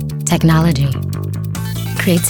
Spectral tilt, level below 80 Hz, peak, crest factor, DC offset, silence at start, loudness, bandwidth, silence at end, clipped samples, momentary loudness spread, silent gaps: -5.5 dB/octave; -32 dBFS; -2 dBFS; 14 dB; under 0.1%; 0 s; -16 LUFS; 19 kHz; 0 s; under 0.1%; 10 LU; none